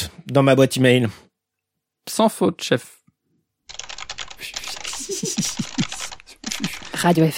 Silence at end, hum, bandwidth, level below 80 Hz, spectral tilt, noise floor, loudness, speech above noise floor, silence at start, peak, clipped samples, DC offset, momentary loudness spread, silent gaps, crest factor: 0 s; none; 16.5 kHz; -54 dBFS; -4.5 dB/octave; -81 dBFS; -21 LUFS; 63 dB; 0 s; -2 dBFS; under 0.1%; under 0.1%; 17 LU; none; 20 dB